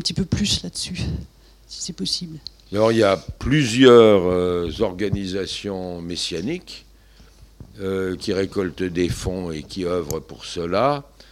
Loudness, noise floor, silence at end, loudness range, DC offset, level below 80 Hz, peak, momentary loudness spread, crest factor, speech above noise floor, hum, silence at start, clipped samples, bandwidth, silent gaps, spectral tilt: -21 LUFS; -49 dBFS; 0.3 s; 10 LU; under 0.1%; -42 dBFS; 0 dBFS; 16 LU; 20 dB; 29 dB; none; 0 s; under 0.1%; 14.5 kHz; none; -5 dB/octave